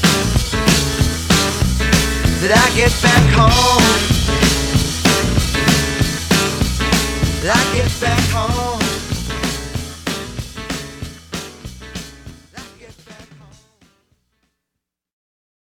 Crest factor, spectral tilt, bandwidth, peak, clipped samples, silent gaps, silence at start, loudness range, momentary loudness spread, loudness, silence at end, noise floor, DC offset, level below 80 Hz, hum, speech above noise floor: 16 dB; -4 dB/octave; 19.5 kHz; 0 dBFS; under 0.1%; none; 0 s; 18 LU; 18 LU; -15 LUFS; 2.4 s; -80 dBFS; under 0.1%; -26 dBFS; none; 67 dB